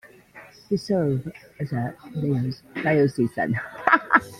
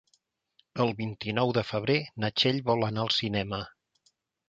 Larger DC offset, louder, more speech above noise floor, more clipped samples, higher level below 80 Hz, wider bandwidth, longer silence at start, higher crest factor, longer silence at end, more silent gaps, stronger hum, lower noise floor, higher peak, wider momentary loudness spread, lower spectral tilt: neither; first, -24 LUFS vs -28 LUFS; second, 24 dB vs 44 dB; neither; about the same, -58 dBFS vs -60 dBFS; first, 14.5 kHz vs 7.8 kHz; second, 0.05 s vs 0.75 s; about the same, 22 dB vs 20 dB; second, 0 s vs 0.8 s; neither; neither; second, -48 dBFS vs -72 dBFS; first, -2 dBFS vs -10 dBFS; about the same, 11 LU vs 9 LU; first, -7.5 dB/octave vs -6 dB/octave